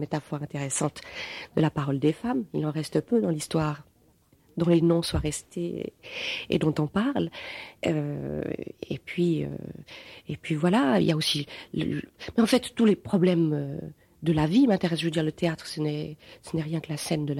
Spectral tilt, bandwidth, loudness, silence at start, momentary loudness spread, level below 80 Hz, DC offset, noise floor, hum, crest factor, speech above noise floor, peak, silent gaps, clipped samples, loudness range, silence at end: -6 dB/octave; 15.5 kHz; -27 LUFS; 0 s; 14 LU; -52 dBFS; under 0.1%; -62 dBFS; none; 18 dB; 35 dB; -8 dBFS; none; under 0.1%; 5 LU; 0 s